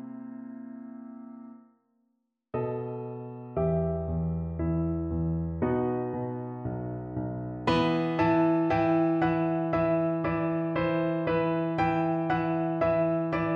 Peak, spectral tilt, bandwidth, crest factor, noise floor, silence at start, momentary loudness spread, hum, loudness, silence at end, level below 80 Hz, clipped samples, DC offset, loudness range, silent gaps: -12 dBFS; -9 dB/octave; 6.8 kHz; 16 dB; -76 dBFS; 0 s; 16 LU; none; -28 LUFS; 0 s; -48 dBFS; under 0.1%; under 0.1%; 8 LU; none